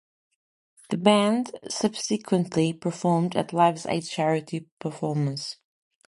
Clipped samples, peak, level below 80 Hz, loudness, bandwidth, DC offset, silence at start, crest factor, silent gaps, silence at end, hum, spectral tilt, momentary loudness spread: under 0.1%; -6 dBFS; -68 dBFS; -25 LUFS; 11.5 kHz; under 0.1%; 0.9 s; 20 dB; 4.72-4.77 s; 0.55 s; none; -5.5 dB/octave; 12 LU